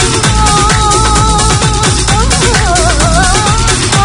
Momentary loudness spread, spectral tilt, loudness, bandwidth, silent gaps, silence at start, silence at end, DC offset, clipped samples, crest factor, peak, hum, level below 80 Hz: 1 LU; -3.5 dB/octave; -8 LUFS; 11.5 kHz; none; 0 s; 0 s; under 0.1%; 0.5%; 8 dB; 0 dBFS; none; -14 dBFS